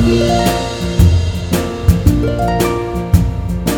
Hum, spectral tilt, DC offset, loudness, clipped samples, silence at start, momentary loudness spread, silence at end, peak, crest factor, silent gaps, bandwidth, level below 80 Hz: none; -6.5 dB/octave; under 0.1%; -15 LUFS; 0.3%; 0 s; 6 LU; 0 s; 0 dBFS; 14 dB; none; 18.5 kHz; -20 dBFS